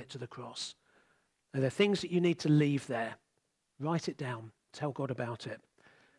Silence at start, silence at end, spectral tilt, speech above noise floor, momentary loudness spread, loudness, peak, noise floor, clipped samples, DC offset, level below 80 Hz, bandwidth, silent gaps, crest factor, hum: 0 s; 0.6 s; -6 dB/octave; 47 dB; 16 LU; -34 LUFS; -16 dBFS; -80 dBFS; under 0.1%; under 0.1%; -78 dBFS; 11.5 kHz; none; 20 dB; none